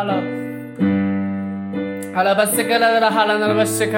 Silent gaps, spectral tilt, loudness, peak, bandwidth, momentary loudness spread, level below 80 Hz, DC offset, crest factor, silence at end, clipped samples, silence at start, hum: none; -4.5 dB/octave; -18 LUFS; -4 dBFS; 17 kHz; 10 LU; -66 dBFS; under 0.1%; 14 dB; 0 s; under 0.1%; 0 s; none